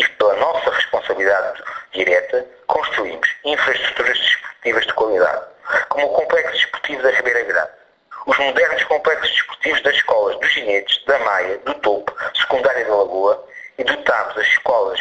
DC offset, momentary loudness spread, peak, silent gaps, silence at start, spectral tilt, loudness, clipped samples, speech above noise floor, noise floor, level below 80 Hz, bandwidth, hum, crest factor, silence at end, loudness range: under 0.1%; 6 LU; -2 dBFS; none; 0 s; -2 dB/octave; -17 LUFS; under 0.1%; 23 dB; -41 dBFS; -56 dBFS; 8.4 kHz; none; 16 dB; 0 s; 2 LU